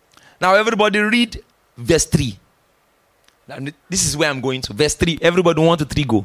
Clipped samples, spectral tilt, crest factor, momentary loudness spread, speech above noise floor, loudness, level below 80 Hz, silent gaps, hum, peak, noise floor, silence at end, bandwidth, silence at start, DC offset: under 0.1%; -4 dB/octave; 16 dB; 16 LU; 43 dB; -17 LUFS; -38 dBFS; none; none; -2 dBFS; -60 dBFS; 0 s; 16 kHz; 0.4 s; under 0.1%